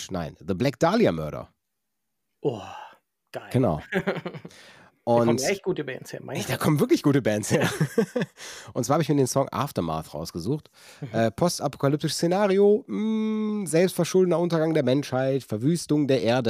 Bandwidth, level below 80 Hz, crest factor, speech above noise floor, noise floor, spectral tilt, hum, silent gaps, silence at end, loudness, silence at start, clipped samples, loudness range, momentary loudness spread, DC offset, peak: 16 kHz; -58 dBFS; 18 dB; 58 dB; -82 dBFS; -6 dB/octave; none; none; 0 s; -25 LUFS; 0 s; under 0.1%; 6 LU; 13 LU; under 0.1%; -8 dBFS